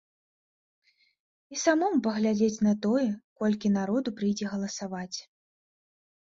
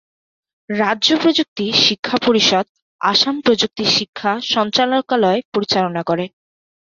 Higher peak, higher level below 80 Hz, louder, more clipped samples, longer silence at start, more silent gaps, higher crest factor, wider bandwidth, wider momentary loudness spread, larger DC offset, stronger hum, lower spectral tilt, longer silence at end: second, -10 dBFS vs -2 dBFS; second, -68 dBFS vs -58 dBFS; second, -28 LUFS vs -16 LUFS; neither; first, 1.5 s vs 0.7 s; second, 3.24-3.36 s vs 1.48-1.56 s, 1.99-2.03 s, 2.69-2.75 s, 2.82-2.99 s, 4.09-4.13 s, 5.45-5.52 s; about the same, 18 dB vs 16 dB; about the same, 7.6 kHz vs 7.4 kHz; about the same, 10 LU vs 8 LU; neither; neither; first, -5.5 dB/octave vs -3.5 dB/octave; first, 1.1 s vs 0.55 s